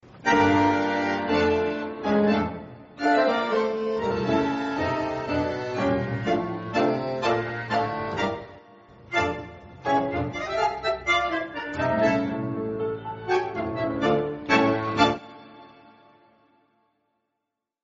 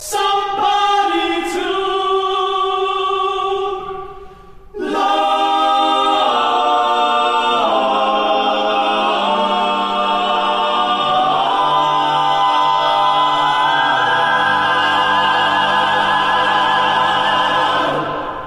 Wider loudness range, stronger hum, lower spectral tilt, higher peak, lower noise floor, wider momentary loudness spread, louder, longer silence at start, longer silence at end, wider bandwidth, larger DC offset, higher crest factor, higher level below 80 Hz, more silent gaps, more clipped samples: about the same, 3 LU vs 4 LU; neither; about the same, -4 dB/octave vs -3 dB/octave; about the same, -6 dBFS vs -4 dBFS; first, -83 dBFS vs -37 dBFS; first, 8 LU vs 5 LU; second, -25 LUFS vs -15 LUFS; first, 0.15 s vs 0 s; first, 2.2 s vs 0 s; second, 7.8 kHz vs 15 kHz; neither; first, 20 dB vs 12 dB; about the same, -52 dBFS vs -50 dBFS; neither; neither